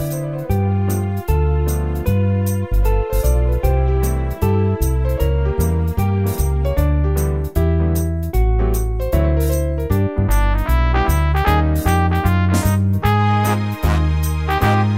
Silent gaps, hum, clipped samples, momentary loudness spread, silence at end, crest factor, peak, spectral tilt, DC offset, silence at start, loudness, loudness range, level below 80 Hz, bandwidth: none; none; under 0.1%; 4 LU; 0 s; 14 dB; -2 dBFS; -7 dB/octave; 0.7%; 0 s; -18 LUFS; 2 LU; -20 dBFS; 16.5 kHz